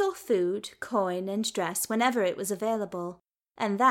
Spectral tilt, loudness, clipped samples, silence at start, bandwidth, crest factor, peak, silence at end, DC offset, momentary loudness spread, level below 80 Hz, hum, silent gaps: -4 dB/octave; -29 LUFS; under 0.1%; 0 s; 17 kHz; 18 dB; -10 dBFS; 0 s; under 0.1%; 9 LU; -74 dBFS; none; none